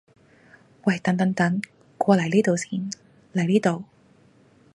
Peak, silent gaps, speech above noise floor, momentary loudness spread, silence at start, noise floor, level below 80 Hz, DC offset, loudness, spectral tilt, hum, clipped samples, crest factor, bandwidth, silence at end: -4 dBFS; none; 35 dB; 12 LU; 0.85 s; -56 dBFS; -68 dBFS; under 0.1%; -23 LUFS; -6.5 dB/octave; none; under 0.1%; 22 dB; 11.5 kHz; 0.9 s